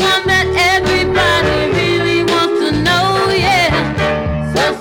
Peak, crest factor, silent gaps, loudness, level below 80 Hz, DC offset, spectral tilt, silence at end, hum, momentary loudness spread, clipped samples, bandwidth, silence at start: -2 dBFS; 12 dB; none; -13 LUFS; -32 dBFS; under 0.1%; -4.5 dB/octave; 0 s; none; 4 LU; under 0.1%; 18 kHz; 0 s